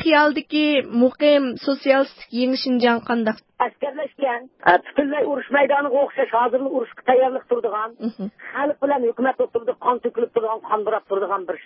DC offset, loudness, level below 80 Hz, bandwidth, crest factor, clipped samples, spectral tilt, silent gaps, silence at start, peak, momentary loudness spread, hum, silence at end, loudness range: under 0.1%; -21 LUFS; -64 dBFS; 5.8 kHz; 18 dB; under 0.1%; -9 dB/octave; none; 0 s; -2 dBFS; 8 LU; none; 0.05 s; 3 LU